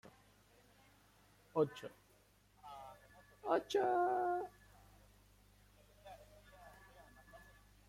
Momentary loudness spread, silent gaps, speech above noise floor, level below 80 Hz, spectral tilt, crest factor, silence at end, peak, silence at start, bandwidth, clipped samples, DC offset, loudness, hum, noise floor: 26 LU; none; 33 dB; -72 dBFS; -5.5 dB/octave; 22 dB; 0.5 s; -22 dBFS; 1.55 s; 16.5 kHz; under 0.1%; under 0.1%; -39 LUFS; 50 Hz at -70 dBFS; -70 dBFS